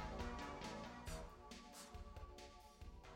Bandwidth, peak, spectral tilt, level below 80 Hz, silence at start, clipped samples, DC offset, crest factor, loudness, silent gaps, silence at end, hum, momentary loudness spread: 16 kHz; -34 dBFS; -4.5 dB/octave; -58 dBFS; 0 s; under 0.1%; under 0.1%; 18 dB; -54 LUFS; none; 0 s; none; 11 LU